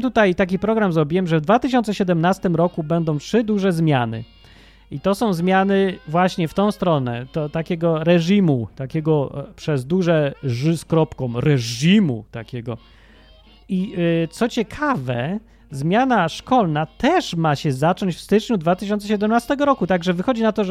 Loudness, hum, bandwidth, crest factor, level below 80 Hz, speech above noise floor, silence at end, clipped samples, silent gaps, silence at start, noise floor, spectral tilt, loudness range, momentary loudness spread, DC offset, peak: -20 LUFS; none; 14.5 kHz; 16 dB; -48 dBFS; 29 dB; 0 s; under 0.1%; none; 0 s; -48 dBFS; -6.5 dB/octave; 3 LU; 8 LU; under 0.1%; -2 dBFS